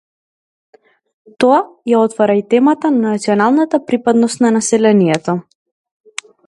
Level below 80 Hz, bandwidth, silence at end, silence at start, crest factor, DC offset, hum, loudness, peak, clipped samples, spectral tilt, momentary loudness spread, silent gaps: -62 dBFS; 11.5 kHz; 1.05 s; 1.4 s; 14 dB; under 0.1%; none; -13 LUFS; 0 dBFS; under 0.1%; -5.5 dB/octave; 8 LU; none